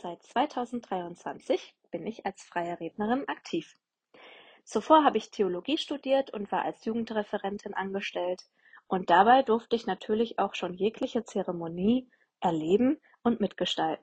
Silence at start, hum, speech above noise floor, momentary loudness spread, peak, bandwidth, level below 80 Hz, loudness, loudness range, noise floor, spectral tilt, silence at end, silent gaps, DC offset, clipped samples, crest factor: 0.05 s; none; 27 dB; 13 LU; -8 dBFS; 9.2 kHz; -68 dBFS; -29 LUFS; 7 LU; -56 dBFS; -5.5 dB/octave; 0.05 s; none; under 0.1%; under 0.1%; 22 dB